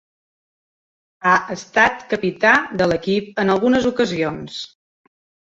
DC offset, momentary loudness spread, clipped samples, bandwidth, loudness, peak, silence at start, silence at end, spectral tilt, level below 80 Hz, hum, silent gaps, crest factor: under 0.1%; 11 LU; under 0.1%; 7.8 kHz; -18 LUFS; -2 dBFS; 1.25 s; 0.75 s; -5 dB/octave; -52 dBFS; none; none; 18 dB